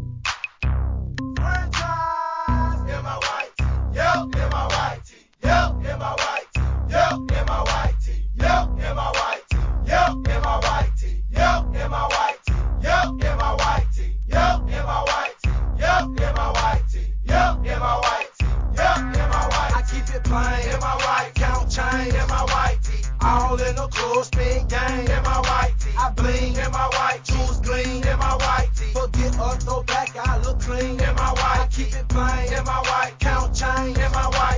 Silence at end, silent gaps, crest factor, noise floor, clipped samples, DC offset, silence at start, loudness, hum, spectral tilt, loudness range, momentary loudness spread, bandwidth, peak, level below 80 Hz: 0 s; none; 16 dB; -41 dBFS; under 0.1%; under 0.1%; 0 s; -22 LUFS; none; -5 dB/octave; 1 LU; 5 LU; 7.6 kHz; -6 dBFS; -24 dBFS